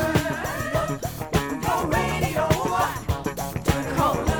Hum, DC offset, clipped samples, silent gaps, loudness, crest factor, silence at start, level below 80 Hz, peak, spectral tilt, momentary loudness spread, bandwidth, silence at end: none; under 0.1%; under 0.1%; none; -25 LUFS; 18 dB; 0 s; -36 dBFS; -6 dBFS; -5 dB/octave; 5 LU; over 20 kHz; 0 s